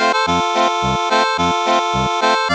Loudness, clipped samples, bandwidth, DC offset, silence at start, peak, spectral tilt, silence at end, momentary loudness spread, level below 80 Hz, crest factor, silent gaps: -16 LUFS; under 0.1%; 10 kHz; under 0.1%; 0 s; -4 dBFS; -3.5 dB/octave; 0 s; 1 LU; -40 dBFS; 12 dB; none